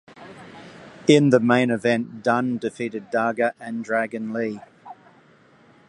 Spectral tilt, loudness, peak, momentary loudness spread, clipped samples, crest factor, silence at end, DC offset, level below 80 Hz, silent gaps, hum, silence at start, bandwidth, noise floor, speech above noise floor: -6 dB/octave; -22 LUFS; -2 dBFS; 25 LU; under 0.1%; 22 dB; 0.95 s; under 0.1%; -68 dBFS; none; none; 0.2 s; 11 kHz; -54 dBFS; 33 dB